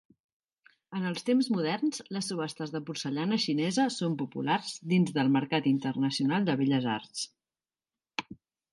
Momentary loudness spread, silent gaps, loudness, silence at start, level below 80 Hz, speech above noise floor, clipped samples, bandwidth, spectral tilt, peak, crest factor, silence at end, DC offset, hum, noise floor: 11 LU; none; -30 LUFS; 0.9 s; -78 dBFS; over 61 dB; under 0.1%; 11.5 kHz; -5.5 dB/octave; -14 dBFS; 18 dB; 0.4 s; under 0.1%; none; under -90 dBFS